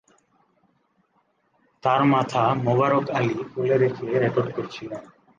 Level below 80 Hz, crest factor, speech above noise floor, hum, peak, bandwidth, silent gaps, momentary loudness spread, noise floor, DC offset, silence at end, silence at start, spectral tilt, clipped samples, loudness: -64 dBFS; 16 dB; 45 dB; none; -8 dBFS; 7.6 kHz; none; 13 LU; -68 dBFS; under 0.1%; 0.3 s; 1.85 s; -7.5 dB/octave; under 0.1%; -22 LUFS